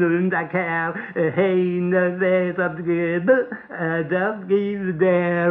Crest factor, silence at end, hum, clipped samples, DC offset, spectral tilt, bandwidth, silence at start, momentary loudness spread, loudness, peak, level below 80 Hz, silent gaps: 14 dB; 0 s; none; under 0.1%; under 0.1%; -11 dB/octave; 3.9 kHz; 0 s; 5 LU; -21 LUFS; -6 dBFS; -64 dBFS; none